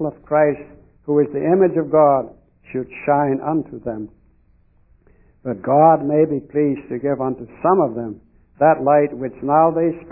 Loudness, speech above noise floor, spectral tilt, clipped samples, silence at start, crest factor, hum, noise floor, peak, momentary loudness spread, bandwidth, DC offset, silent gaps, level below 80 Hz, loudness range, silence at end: -18 LUFS; 38 dB; -13.5 dB/octave; under 0.1%; 0 s; 18 dB; none; -55 dBFS; 0 dBFS; 15 LU; 3 kHz; under 0.1%; none; -54 dBFS; 5 LU; 0 s